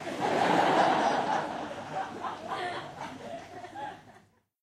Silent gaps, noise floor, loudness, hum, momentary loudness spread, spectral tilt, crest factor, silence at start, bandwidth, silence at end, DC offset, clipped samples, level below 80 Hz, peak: none; -61 dBFS; -29 LUFS; none; 18 LU; -4.5 dB/octave; 18 dB; 0 s; 14 kHz; 0.45 s; under 0.1%; under 0.1%; -70 dBFS; -12 dBFS